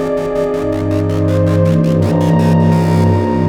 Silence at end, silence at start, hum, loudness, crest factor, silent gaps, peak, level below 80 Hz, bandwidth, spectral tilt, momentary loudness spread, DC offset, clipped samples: 0 s; 0 s; none; -13 LUFS; 12 dB; none; 0 dBFS; -38 dBFS; 11.5 kHz; -8.5 dB/octave; 5 LU; under 0.1%; under 0.1%